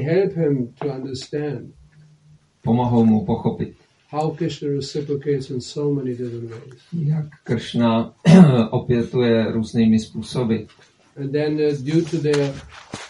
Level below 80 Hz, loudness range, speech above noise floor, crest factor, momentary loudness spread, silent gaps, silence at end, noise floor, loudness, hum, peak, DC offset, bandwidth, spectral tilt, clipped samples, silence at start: -52 dBFS; 8 LU; 34 dB; 20 dB; 13 LU; none; 0 s; -53 dBFS; -20 LUFS; none; 0 dBFS; under 0.1%; 11 kHz; -7.5 dB/octave; under 0.1%; 0 s